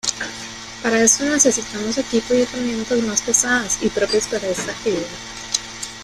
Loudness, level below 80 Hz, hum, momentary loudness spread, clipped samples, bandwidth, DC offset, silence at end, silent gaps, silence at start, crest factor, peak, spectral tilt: -19 LUFS; -48 dBFS; none; 14 LU; under 0.1%; 15 kHz; under 0.1%; 0 s; none; 0.05 s; 20 dB; 0 dBFS; -2 dB/octave